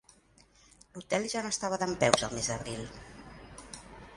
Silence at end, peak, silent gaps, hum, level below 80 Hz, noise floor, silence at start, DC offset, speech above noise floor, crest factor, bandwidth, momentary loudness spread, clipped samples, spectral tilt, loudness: 0 s; -2 dBFS; none; none; -56 dBFS; -62 dBFS; 0.95 s; under 0.1%; 31 dB; 32 dB; 11.5 kHz; 22 LU; under 0.1%; -3 dB/octave; -31 LUFS